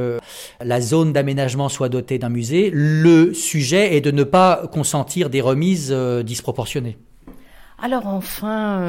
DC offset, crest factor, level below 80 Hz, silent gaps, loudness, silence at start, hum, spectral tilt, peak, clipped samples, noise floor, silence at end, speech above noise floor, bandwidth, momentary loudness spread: under 0.1%; 16 dB; -50 dBFS; none; -18 LUFS; 0 s; none; -5.5 dB/octave; -4 dBFS; under 0.1%; -42 dBFS; 0 s; 24 dB; 17 kHz; 11 LU